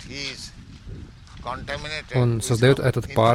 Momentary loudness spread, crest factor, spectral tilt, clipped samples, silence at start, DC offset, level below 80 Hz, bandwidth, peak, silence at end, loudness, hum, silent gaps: 22 LU; 18 dB; -5.5 dB/octave; under 0.1%; 0 s; under 0.1%; -44 dBFS; 15 kHz; -6 dBFS; 0 s; -23 LUFS; none; none